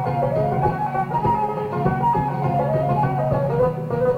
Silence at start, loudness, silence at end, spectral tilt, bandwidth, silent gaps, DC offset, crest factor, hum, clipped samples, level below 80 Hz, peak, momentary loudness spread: 0 s; -21 LUFS; 0 s; -9.5 dB/octave; 5.2 kHz; none; under 0.1%; 14 dB; none; under 0.1%; -42 dBFS; -6 dBFS; 2 LU